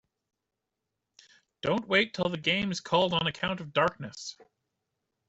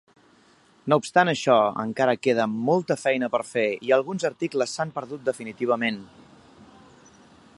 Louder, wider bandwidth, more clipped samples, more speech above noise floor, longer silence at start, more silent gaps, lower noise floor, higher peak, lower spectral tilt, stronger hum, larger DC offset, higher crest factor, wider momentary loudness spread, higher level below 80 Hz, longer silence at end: second, -28 LUFS vs -24 LUFS; second, 8.2 kHz vs 11.5 kHz; neither; first, 57 dB vs 34 dB; first, 1.65 s vs 0.85 s; neither; first, -86 dBFS vs -58 dBFS; second, -10 dBFS vs -4 dBFS; about the same, -4.5 dB/octave vs -5 dB/octave; neither; neither; about the same, 22 dB vs 22 dB; first, 14 LU vs 9 LU; first, -64 dBFS vs -70 dBFS; second, 0.85 s vs 1.5 s